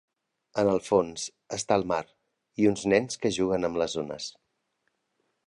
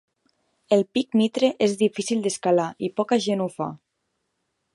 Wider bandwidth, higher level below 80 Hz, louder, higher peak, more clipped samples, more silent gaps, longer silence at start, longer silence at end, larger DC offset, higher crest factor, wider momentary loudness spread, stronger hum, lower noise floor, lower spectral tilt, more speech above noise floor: about the same, 11.5 kHz vs 11.5 kHz; first, -60 dBFS vs -72 dBFS; second, -27 LUFS vs -23 LUFS; about the same, -8 dBFS vs -6 dBFS; neither; neither; second, 0.55 s vs 0.7 s; first, 1.15 s vs 1 s; neither; about the same, 22 dB vs 18 dB; first, 11 LU vs 6 LU; neither; about the same, -77 dBFS vs -76 dBFS; about the same, -4.5 dB/octave vs -5 dB/octave; second, 50 dB vs 54 dB